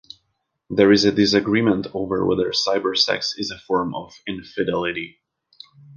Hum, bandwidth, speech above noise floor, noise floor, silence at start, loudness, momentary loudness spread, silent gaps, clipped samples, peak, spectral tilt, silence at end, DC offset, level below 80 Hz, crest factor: none; 7.4 kHz; 53 dB; -73 dBFS; 0.7 s; -20 LUFS; 15 LU; none; under 0.1%; -2 dBFS; -4.5 dB/octave; 0 s; under 0.1%; -52 dBFS; 20 dB